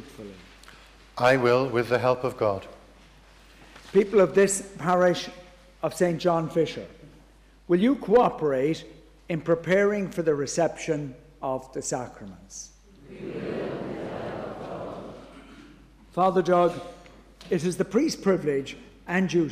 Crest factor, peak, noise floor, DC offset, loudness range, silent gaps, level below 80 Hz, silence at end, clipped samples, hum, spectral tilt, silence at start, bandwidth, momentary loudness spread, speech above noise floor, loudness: 16 dB; -10 dBFS; -54 dBFS; under 0.1%; 10 LU; none; -56 dBFS; 0 s; under 0.1%; none; -5.5 dB/octave; 0 s; 15 kHz; 20 LU; 30 dB; -25 LUFS